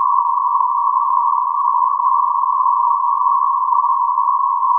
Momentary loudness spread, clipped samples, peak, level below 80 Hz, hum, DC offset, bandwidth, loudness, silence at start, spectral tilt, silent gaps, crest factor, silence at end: 1 LU; under 0.1%; -4 dBFS; under -90 dBFS; none; under 0.1%; 1.3 kHz; -15 LUFS; 0 s; 10 dB/octave; none; 12 dB; 0 s